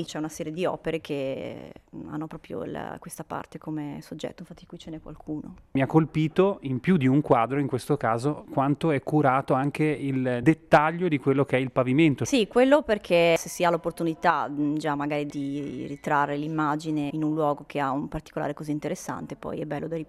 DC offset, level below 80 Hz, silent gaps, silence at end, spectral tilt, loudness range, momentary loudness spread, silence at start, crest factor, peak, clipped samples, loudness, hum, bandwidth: under 0.1%; -56 dBFS; none; 0.05 s; -6.5 dB/octave; 12 LU; 15 LU; 0 s; 20 dB; -6 dBFS; under 0.1%; -26 LUFS; none; 14 kHz